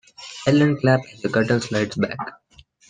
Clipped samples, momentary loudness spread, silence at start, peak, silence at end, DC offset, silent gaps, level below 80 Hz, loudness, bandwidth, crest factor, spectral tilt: under 0.1%; 13 LU; 0.2 s; -4 dBFS; 0.6 s; under 0.1%; none; -58 dBFS; -21 LUFS; 9.6 kHz; 18 dB; -6.5 dB/octave